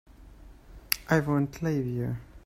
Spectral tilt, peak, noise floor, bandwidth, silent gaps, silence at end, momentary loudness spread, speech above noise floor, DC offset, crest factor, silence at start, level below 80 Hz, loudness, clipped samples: -5.5 dB/octave; -4 dBFS; -50 dBFS; 16 kHz; none; 0.05 s; 7 LU; 22 dB; under 0.1%; 26 dB; 0.2 s; -50 dBFS; -29 LUFS; under 0.1%